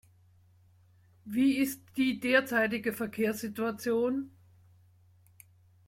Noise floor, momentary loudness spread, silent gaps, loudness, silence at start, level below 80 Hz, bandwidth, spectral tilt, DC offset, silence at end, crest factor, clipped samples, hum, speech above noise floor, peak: -62 dBFS; 8 LU; none; -30 LUFS; 1.25 s; -72 dBFS; 16.5 kHz; -4.5 dB/octave; under 0.1%; 1.6 s; 20 dB; under 0.1%; none; 33 dB; -12 dBFS